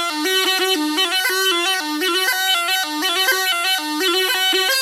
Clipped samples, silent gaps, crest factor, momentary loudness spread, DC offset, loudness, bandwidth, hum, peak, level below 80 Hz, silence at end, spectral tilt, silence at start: under 0.1%; none; 14 dB; 3 LU; under 0.1%; -17 LUFS; 17 kHz; none; -6 dBFS; -76 dBFS; 0 s; 2 dB/octave; 0 s